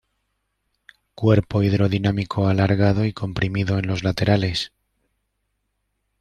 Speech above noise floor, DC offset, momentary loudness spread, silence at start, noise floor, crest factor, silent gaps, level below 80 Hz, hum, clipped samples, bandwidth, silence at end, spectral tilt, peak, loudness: 54 dB; under 0.1%; 6 LU; 1.2 s; -74 dBFS; 20 dB; none; -48 dBFS; none; under 0.1%; 9.4 kHz; 1.55 s; -7 dB/octave; -2 dBFS; -21 LUFS